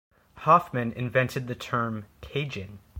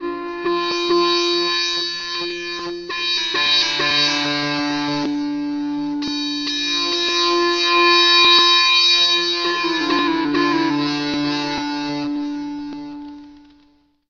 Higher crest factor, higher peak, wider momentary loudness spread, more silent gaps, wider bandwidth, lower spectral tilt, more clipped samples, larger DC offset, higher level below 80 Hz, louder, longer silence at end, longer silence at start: about the same, 20 dB vs 16 dB; second, -8 dBFS vs -4 dBFS; about the same, 13 LU vs 14 LU; neither; first, 17 kHz vs 7.8 kHz; first, -6.5 dB/octave vs -2.5 dB/octave; neither; neither; about the same, -56 dBFS vs -56 dBFS; second, -27 LUFS vs -17 LUFS; second, 0 s vs 0.7 s; first, 0.35 s vs 0 s